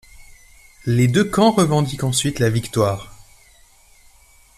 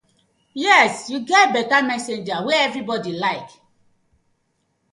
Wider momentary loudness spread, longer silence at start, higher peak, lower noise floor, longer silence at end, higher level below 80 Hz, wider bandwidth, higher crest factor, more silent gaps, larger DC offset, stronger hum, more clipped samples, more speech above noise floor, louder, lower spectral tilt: second, 7 LU vs 12 LU; first, 0.85 s vs 0.55 s; about the same, -4 dBFS vs -2 dBFS; second, -51 dBFS vs -69 dBFS; about the same, 1.45 s vs 1.45 s; first, -46 dBFS vs -68 dBFS; first, 14.5 kHz vs 11.5 kHz; about the same, 18 dB vs 20 dB; neither; neither; neither; neither; second, 34 dB vs 50 dB; about the same, -18 LUFS vs -18 LUFS; first, -5.5 dB/octave vs -3 dB/octave